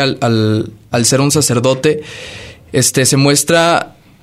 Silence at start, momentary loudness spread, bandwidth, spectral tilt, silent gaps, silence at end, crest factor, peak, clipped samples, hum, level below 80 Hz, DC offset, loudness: 0 s; 18 LU; 16 kHz; -4 dB/octave; none; 0.3 s; 14 dB; 0 dBFS; under 0.1%; none; -48 dBFS; under 0.1%; -12 LUFS